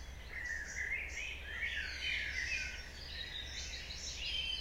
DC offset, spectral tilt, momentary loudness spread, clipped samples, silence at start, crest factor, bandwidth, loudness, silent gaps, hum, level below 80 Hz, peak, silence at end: under 0.1%; -1 dB/octave; 7 LU; under 0.1%; 0 s; 16 dB; 16 kHz; -40 LUFS; none; none; -50 dBFS; -26 dBFS; 0 s